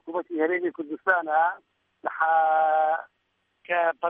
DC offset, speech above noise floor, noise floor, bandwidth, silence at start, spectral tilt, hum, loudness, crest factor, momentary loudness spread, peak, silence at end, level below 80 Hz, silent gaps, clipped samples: under 0.1%; 50 dB; -74 dBFS; 3.7 kHz; 0.05 s; -7 dB/octave; none; -25 LUFS; 18 dB; 10 LU; -8 dBFS; 0 s; -84 dBFS; none; under 0.1%